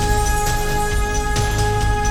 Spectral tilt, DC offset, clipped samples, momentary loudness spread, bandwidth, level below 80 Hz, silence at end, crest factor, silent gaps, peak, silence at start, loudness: -4 dB/octave; under 0.1%; under 0.1%; 2 LU; 18 kHz; -22 dBFS; 0 s; 14 dB; none; -4 dBFS; 0 s; -20 LUFS